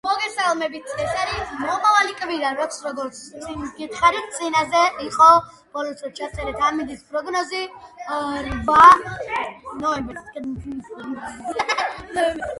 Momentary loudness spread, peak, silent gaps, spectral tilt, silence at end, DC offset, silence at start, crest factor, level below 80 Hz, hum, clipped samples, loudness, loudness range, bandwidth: 19 LU; 0 dBFS; none; -3.5 dB/octave; 0 s; under 0.1%; 0.05 s; 20 dB; -46 dBFS; none; under 0.1%; -20 LUFS; 7 LU; 11.5 kHz